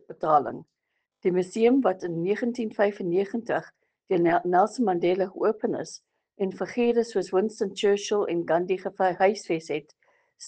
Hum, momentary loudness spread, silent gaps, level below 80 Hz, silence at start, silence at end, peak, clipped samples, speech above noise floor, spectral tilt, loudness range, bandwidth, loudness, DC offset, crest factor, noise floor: none; 9 LU; none; -70 dBFS; 0.1 s; 0 s; -8 dBFS; under 0.1%; 48 dB; -5.5 dB/octave; 1 LU; 9.2 kHz; -26 LUFS; under 0.1%; 18 dB; -73 dBFS